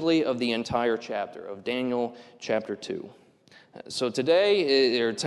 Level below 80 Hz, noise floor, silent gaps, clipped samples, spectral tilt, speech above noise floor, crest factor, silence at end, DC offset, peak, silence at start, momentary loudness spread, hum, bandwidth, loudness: -64 dBFS; -56 dBFS; none; under 0.1%; -4.5 dB/octave; 30 dB; 16 dB; 0 s; under 0.1%; -10 dBFS; 0 s; 15 LU; none; 12 kHz; -26 LUFS